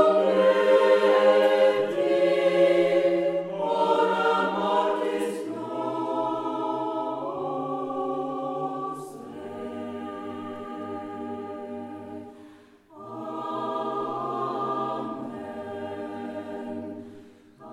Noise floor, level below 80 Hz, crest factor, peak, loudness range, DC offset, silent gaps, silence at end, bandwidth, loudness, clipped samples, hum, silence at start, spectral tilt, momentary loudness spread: -52 dBFS; -74 dBFS; 18 dB; -8 dBFS; 15 LU; under 0.1%; none; 0 s; 12 kHz; -26 LUFS; under 0.1%; none; 0 s; -5.5 dB/octave; 17 LU